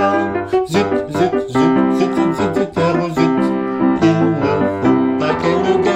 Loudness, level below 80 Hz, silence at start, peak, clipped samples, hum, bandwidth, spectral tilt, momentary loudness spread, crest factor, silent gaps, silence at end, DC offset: -16 LUFS; -46 dBFS; 0 s; -2 dBFS; under 0.1%; none; 11 kHz; -7 dB/octave; 4 LU; 14 dB; none; 0 s; under 0.1%